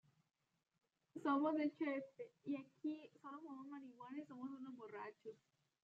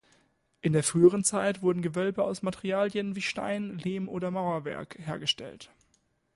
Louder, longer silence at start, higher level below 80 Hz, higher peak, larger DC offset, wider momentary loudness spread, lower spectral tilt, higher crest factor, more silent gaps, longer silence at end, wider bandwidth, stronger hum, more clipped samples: second, -47 LUFS vs -29 LUFS; first, 1.15 s vs 0.65 s; second, under -90 dBFS vs -64 dBFS; second, -28 dBFS vs -8 dBFS; neither; first, 16 LU vs 12 LU; about the same, -4.5 dB/octave vs -4.5 dB/octave; about the same, 20 dB vs 20 dB; neither; second, 0.5 s vs 0.7 s; second, 7.6 kHz vs 11.5 kHz; neither; neither